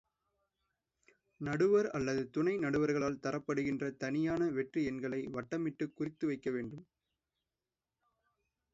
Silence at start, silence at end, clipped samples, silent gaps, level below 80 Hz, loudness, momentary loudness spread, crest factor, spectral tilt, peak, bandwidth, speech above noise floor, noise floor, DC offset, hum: 1.4 s; 1.9 s; under 0.1%; none; -68 dBFS; -35 LUFS; 9 LU; 18 dB; -6.5 dB/octave; -20 dBFS; 7.6 kHz; over 55 dB; under -90 dBFS; under 0.1%; none